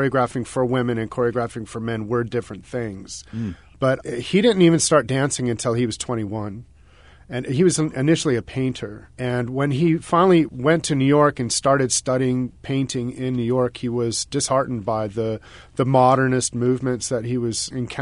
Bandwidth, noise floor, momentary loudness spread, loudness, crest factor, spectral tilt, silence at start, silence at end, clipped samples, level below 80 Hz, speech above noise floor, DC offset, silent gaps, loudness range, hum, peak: 11 kHz; -49 dBFS; 13 LU; -21 LUFS; 18 dB; -5 dB/octave; 0 s; 0 s; under 0.1%; -50 dBFS; 28 dB; 0.1%; none; 5 LU; none; -2 dBFS